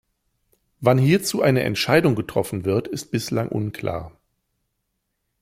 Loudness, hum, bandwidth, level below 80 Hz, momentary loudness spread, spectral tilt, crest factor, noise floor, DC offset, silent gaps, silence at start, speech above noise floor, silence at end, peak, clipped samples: -21 LUFS; none; 16 kHz; -54 dBFS; 9 LU; -5.5 dB/octave; 20 dB; -76 dBFS; under 0.1%; none; 0.8 s; 55 dB; 1.3 s; -2 dBFS; under 0.1%